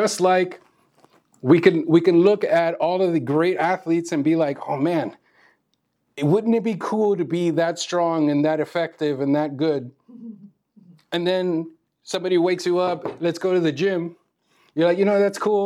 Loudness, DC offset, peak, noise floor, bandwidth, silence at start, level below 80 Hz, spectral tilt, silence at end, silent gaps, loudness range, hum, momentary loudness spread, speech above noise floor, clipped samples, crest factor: -21 LUFS; under 0.1%; -2 dBFS; -72 dBFS; 12.5 kHz; 0 s; -78 dBFS; -6 dB/octave; 0 s; none; 6 LU; none; 12 LU; 51 dB; under 0.1%; 20 dB